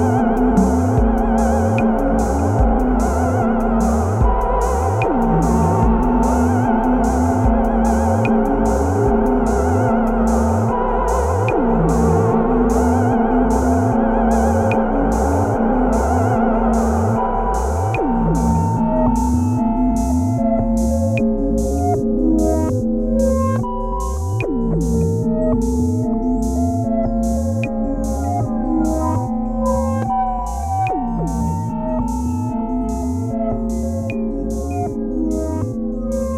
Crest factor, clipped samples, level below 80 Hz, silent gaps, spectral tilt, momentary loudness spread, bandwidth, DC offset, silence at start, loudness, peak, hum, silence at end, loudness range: 14 dB; under 0.1%; -24 dBFS; none; -8 dB/octave; 6 LU; 14.5 kHz; under 0.1%; 0 s; -18 LUFS; -2 dBFS; none; 0 s; 5 LU